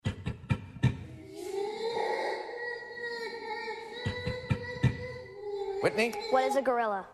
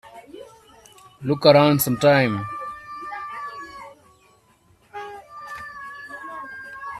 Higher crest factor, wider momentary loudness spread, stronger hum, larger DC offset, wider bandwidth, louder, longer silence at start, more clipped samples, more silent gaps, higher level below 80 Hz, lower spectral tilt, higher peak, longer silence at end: about the same, 20 dB vs 22 dB; second, 12 LU vs 25 LU; neither; neither; second, 13.5 kHz vs 15.5 kHz; second, -33 LUFS vs -20 LUFS; about the same, 0.05 s vs 0.05 s; neither; neither; first, -54 dBFS vs -60 dBFS; about the same, -6 dB/octave vs -5 dB/octave; second, -14 dBFS vs -2 dBFS; about the same, 0 s vs 0 s